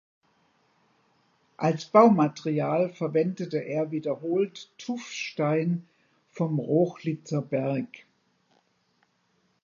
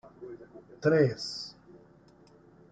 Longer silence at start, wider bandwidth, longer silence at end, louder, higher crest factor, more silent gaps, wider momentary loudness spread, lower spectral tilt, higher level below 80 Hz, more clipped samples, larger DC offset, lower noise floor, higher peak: first, 1.6 s vs 0.2 s; second, 7.4 kHz vs 9.2 kHz; first, 1.65 s vs 0.95 s; first, -26 LUFS vs -29 LUFS; about the same, 22 dB vs 20 dB; neither; second, 13 LU vs 23 LU; about the same, -7 dB/octave vs -6 dB/octave; second, -78 dBFS vs -68 dBFS; neither; neither; first, -70 dBFS vs -58 dBFS; first, -6 dBFS vs -12 dBFS